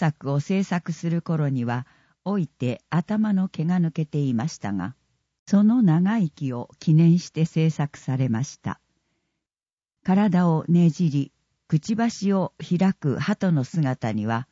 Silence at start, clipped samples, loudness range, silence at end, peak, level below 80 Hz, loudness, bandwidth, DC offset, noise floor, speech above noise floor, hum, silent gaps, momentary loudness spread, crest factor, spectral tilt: 0 s; under 0.1%; 4 LU; 0.1 s; -8 dBFS; -64 dBFS; -23 LUFS; 7.8 kHz; under 0.1%; under -90 dBFS; over 68 dB; none; 5.39-5.46 s, 9.73-9.77 s; 10 LU; 14 dB; -7.5 dB/octave